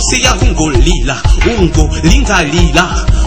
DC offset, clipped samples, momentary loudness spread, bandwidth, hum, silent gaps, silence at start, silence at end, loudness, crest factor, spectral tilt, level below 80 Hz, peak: 2%; 2%; 3 LU; 11 kHz; none; none; 0 s; 0 s; -10 LUFS; 10 dB; -4 dB/octave; -12 dBFS; 0 dBFS